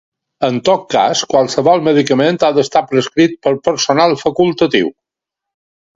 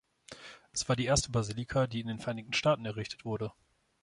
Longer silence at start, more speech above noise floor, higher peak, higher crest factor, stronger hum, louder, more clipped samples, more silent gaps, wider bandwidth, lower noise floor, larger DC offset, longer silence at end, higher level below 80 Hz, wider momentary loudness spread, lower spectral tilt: about the same, 0.4 s vs 0.3 s; first, 70 dB vs 20 dB; first, 0 dBFS vs -14 dBFS; second, 14 dB vs 20 dB; neither; first, -13 LUFS vs -33 LUFS; neither; neither; second, 7.8 kHz vs 11.5 kHz; first, -82 dBFS vs -52 dBFS; neither; first, 1.05 s vs 0.5 s; about the same, -54 dBFS vs -52 dBFS; second, 4 LU vs 17 LU; about the same, -4.5 dB/octave vs -4.5 dB/octave